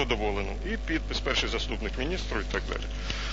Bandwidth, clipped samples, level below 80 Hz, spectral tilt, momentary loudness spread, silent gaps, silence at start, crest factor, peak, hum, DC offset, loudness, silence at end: 7.8 kHz; under 0.1%; -34 dBFS; -4.5 dB/octave; 6 LU; none; 0 s; 18 dB; -12 dBFS; 50 Hz at -35 dBFS; 0.6%; -31 LUFS; 0 s